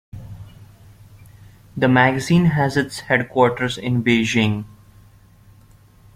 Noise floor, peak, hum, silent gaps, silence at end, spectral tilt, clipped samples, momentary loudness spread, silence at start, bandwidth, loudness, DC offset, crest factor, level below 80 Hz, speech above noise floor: -49 dBFS; -2 dBFS; none; none; 1.5 s; -6 dB/octave; under 0.1%; 22 LU; 0.15 s; 15 kHz; -18 LUFS; under 0.1%; 20 dB; -50 dBFS; 32 dB